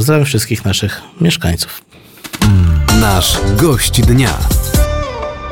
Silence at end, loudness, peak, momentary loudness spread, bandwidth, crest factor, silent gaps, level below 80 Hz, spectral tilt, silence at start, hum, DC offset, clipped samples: 0 s; -13 LUFS; 0 dBFS; 11 LU; 18 kHz; 12 dB; none; -20 dBFS; -4.5 dB/octave; 0 s; none; under 0.1%; under 0.1%